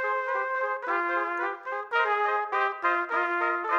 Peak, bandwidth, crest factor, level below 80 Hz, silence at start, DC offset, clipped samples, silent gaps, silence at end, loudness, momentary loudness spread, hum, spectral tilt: -10 dBFS; 8 kHz; 16 dB; -88 dBFS; 0 s; under 0.1%; under 0.1%; none; 0 s; -27 LUFS; 4 LU; none; -2.5 dB/octave